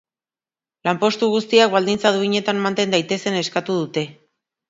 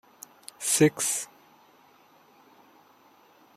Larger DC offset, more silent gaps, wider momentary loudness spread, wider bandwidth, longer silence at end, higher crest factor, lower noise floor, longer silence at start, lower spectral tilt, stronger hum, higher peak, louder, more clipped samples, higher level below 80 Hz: neither; neither; second, 9 LU vs 24 LU; second, 7.8 kHz vs 16 kHz; second, 0.55 s vs 2.3 s; about the same, 20 dB vs 24 dB; first, under -90 dBFS vs -59 dBFS; first, 0.85 s vs 0.6 s; about the same, -4.5 dB/octave vs -3.5 dB/octave; neither; first, 0 dBFS vs -8 dBFS; first, -19 LUFS vs -25 LUFS; neither; first, -64 dBFS vs -70 dBFS